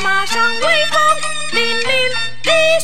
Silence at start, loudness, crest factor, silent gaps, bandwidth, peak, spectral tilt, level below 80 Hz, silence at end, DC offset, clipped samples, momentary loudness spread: 0 s; -14 LUFS; 14 dB; none; 16.5 kHz; -2 dBFS; -1 dB/octave; -52 dBFS; 0 s; 10%; under 0.1%; 6 LU